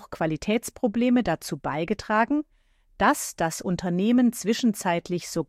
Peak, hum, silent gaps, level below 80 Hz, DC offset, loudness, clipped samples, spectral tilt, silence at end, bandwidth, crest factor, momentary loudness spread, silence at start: -8 dBFS; none; none; -52 dBFS; under 0.1%; -25 LUFS; under 0.1%; -5 dB/octave; 0.05 s; 15.5 kHz; 16 dB; 7 LU; 0 s